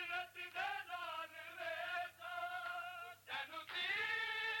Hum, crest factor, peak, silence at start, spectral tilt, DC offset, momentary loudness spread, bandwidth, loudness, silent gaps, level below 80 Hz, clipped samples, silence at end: none; 14 dB; -32 dBFS; 0 s; -1 dB/octave; under 0.1%; 9 LU; 17 kHz; -43 LUFS; none; -86 dBFS; under 0.1%; 0 s